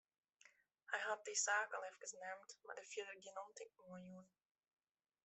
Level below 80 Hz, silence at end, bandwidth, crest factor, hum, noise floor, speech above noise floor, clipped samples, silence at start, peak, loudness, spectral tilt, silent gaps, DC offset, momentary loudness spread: under -90 dBFS; 1 s; 8.2 kHz; 22 dB; none; -73 dBFS; 25 dB; under 0.1%; 0.45 s; -26 dBFS; -46 LUFS; -0.5 dB/octave; none; under 0.1%; 19 LU